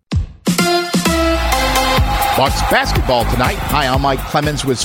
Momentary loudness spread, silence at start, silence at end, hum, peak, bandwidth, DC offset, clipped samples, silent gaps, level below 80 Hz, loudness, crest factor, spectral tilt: 3 LU; 0.1 s; 0 s; none; 0 dBFS; 17 kHz; under 0.1%; under 0.1%; none; -24 dBFS; -15 LUFS; 14 dB; -4 dB/octave